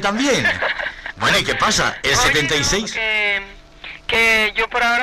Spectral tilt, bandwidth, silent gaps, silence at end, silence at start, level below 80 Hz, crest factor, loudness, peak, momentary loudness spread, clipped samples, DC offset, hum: -2 dB/octave; 15.5 kHz; none; 0 s; 0 s; -38 dBFS; 14 dB; -16 LUFS; -4 dBFS; 11 LU; under 0.1%; under 0.1%; none